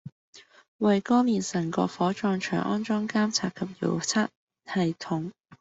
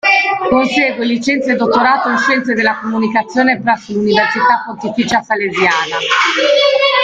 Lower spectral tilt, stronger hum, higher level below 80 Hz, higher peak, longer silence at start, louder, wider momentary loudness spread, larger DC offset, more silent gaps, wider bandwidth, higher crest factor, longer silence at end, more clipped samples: about the same, -5 dB/octave vs -4 dB/octave; neither; second, -68 dBFS vs -52 dBFS; second, -10 dBFS vs 0 dBFS; about the same, 0.05 s vs 0.05 s; second, -27 LUFS vs -13 LUFS; first, 9 LU vs 5 LU; neither; first, 0.12-0.33 s, 0.68-0.79 s, 4.36-4.48 s, 5.40-5.44 s vs none; about the same, 8.2 kHz vs 9 kHz; first, 18 dB vs 12 dB; about the same, 0.05 s vs 0 s; neither